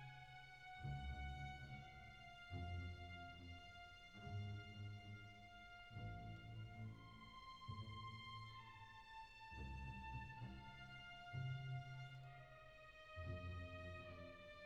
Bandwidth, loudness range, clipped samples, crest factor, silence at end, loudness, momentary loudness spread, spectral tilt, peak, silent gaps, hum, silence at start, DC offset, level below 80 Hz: 10.5 kHz; 3 LU; under 0.1%; 16 dB; 0 s; -55 LUFS; 9 LU; -6 dB/octave; -38 dBFS; none; none; 0 s; under 0.1%; -64 dBFS